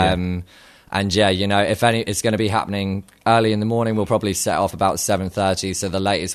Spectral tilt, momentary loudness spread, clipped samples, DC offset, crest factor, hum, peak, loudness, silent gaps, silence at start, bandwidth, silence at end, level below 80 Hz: -4.5 dB/octave; 7 LU; under 0.1%; under 0.1%; 20 dB; none; 0 dBFS; -20 LUFS; none; 0 s; 13.5 kHz; 0 s; -44 dBFS